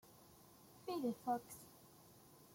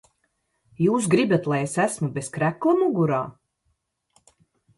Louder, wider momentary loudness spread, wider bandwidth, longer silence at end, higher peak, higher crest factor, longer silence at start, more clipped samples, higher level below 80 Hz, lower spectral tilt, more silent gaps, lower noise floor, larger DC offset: second, -45 LUFS vs -23 LUFS; first, 21 LU vs 8 LU; first, 16.5 kHz vs 11.5 kHz; second, 0 s vs 1.45 s; second, -30 dBFS vs -6 dBFS; about the same, 18 dB vs 18 dB; second, 0.05 s vs 0.8 s; neither; second, -82 dBFS vs -64 dBFS; about the same, -5 dB/octave vs -6 dB/octave; neither; second, -65 dBFS vs -73 dBFS; neither